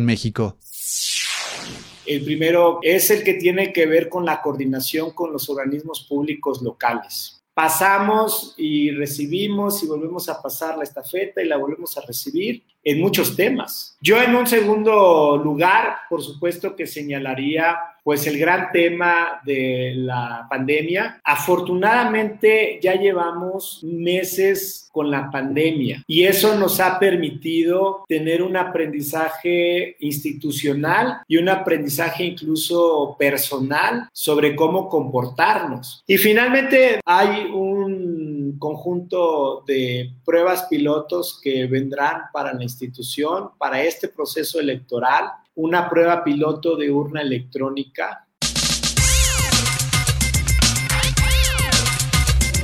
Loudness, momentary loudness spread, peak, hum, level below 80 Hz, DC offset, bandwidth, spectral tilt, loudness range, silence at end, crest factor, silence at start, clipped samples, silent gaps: -19 LUFS; 10 LU; -2 dBFS; none; -34 dBFS; under 0.1%; 17.5 kHz; -4 dB/octave; 6 LU; 0 s; 18 dB; 0 s; under 0.1%; none